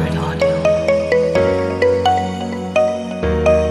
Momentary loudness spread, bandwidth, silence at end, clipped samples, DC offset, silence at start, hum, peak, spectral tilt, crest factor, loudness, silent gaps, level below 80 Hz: 5 LU; 12 kHz; 0 s; under 0.1%; under 0.1%; 0 s; none; -2 dBFS; -6.5 dB/octave; 14 dB; -16 LUFS; none; -32 dBFS